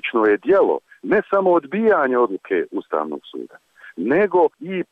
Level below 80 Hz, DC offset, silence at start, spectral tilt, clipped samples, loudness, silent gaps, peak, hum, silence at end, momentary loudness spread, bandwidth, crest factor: -62 dBFS; under 0.1%; 0.05 s; -8 dB/octave; under 0.1%; -19 LUFS; none; -8 dBFS; none; 0.1 s; 14 LU; 4.5 kHz; 12 dB